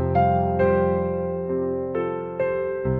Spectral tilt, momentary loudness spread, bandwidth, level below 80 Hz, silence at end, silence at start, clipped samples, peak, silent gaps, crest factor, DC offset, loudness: -11 dB/octave; 6 LU; 4.5 kHz; -46 dBFS; 0 s; 0 s; under 0.1%; -8 dBFS; none; 14 dB; under 0.1%; -23 LUFS